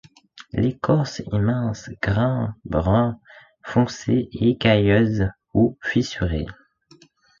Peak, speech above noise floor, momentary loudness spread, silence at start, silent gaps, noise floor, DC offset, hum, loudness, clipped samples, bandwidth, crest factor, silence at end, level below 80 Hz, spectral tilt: -4 dBFS; 34 dB; 9 LU; 0.35 s; none; -54 dBFS; under 0.1%; none; -22 LUFS; under 0.1%; 7.4 kHz; 18 dB; 0.85 s; -40 dBFS; -7 dB/octave